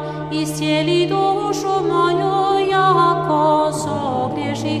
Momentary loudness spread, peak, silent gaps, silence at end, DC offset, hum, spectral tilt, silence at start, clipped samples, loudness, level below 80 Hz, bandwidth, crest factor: 7 LU; -4 dBFS; none; 0 s; under 0.1%; none; -5.5 dB/octave; 0 s; under 0.1%; -17 LUFS; -50 dBFS; 15 kHz; 14 dB